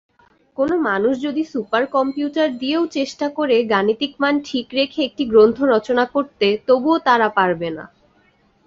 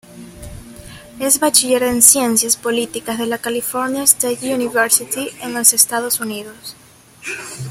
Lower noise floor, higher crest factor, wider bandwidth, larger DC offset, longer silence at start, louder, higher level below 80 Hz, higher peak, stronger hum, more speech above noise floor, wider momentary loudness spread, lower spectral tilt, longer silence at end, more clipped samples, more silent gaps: first, -58 dBFS vs -37 dBFS; about the same, 16 dB vs 18 dB; second, 7.6 kHz vs 17.5 kHz; neither; first, 0.6 s vs 0.1 s; second, -18 LUFS vs -14 LUFS; second, -58 dBFS vs -48 dBFS; about the same, -2 dBFS vs 0 dBFS; neither; first, 40 dB vs 20 dB; second, 8 LU vs 22 LU; first, -5.5 dB/octave vs -1.5 dB/octave; first, 0.8 s vs 0 s; neither; neither